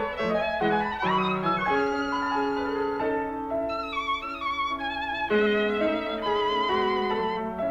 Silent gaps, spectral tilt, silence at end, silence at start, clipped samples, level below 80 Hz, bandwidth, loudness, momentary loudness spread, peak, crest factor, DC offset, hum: none; -6 dB/octave; 0 s; 0 s; under 0.1%; -52 dBFS; 7.8 kHz; -26 LUFS; 5 LU; -12 dBFS; 14 dB; under 0.1%; none